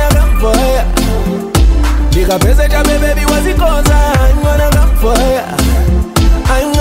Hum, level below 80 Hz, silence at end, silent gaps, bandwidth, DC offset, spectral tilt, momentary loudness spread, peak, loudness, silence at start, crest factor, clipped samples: none; -10 dBFS; 0 s; none; 16.5 kHz; under 0.1%; -5.5 dB/octave; 3 LU; 0 dBFS; -11 LUFS; 0 s; 8 dB; under 0.1%